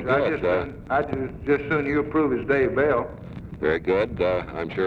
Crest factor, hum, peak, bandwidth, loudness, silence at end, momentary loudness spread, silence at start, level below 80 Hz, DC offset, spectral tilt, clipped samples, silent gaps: 14 dB; none; -10 dBFS; 6.4 kHz; -24 LUFS; 0 s; 7 LU; 0 s; -44 dBFS; under 0.1%; -8.5 dB/octave; under 0.1%; none